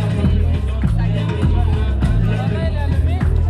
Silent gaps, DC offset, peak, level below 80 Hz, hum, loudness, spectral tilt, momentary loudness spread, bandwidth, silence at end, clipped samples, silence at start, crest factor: none; under 0.1%; -4 dBFS; -20 dBFS; none; -18 LUFS; -8.5 dB/octave; 2 LU; 10 kHz; 0 s; under 0.1%; 0 s; 12 dB